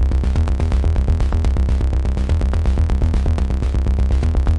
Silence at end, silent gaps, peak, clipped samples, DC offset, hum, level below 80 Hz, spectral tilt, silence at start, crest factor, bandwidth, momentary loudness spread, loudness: 0 s; none; -6 dBFS; under 0.1%; under 0.1%; none; -18 dBFS; -8 dB/octave; 0 s; 10 dB; 9.2 kHz; 2 LU; -19 LUFS